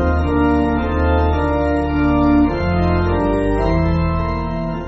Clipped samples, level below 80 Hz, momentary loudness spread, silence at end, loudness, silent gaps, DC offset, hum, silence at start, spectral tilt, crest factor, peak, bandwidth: under 0.1%; -22 dBFS; 4 LU; 0 s; -17 LUFS; none; under 0.1%; none; 0 s; -7.5 dB/octave; 12 dB; -4 dBFS; 7.8 kHz